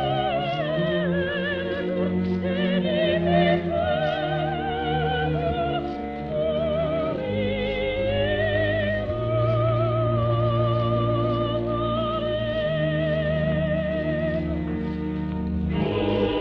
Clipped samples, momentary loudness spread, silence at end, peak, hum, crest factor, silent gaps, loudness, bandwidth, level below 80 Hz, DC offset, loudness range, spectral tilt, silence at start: under 0.1%; 5 LU; 0 s; -8 dBFS; none; 14 dB; none; -24 LUFS; 5.8 kHz; -40 dBFS; under 0.1%; 2 LU; -9 dB/octave; 0 s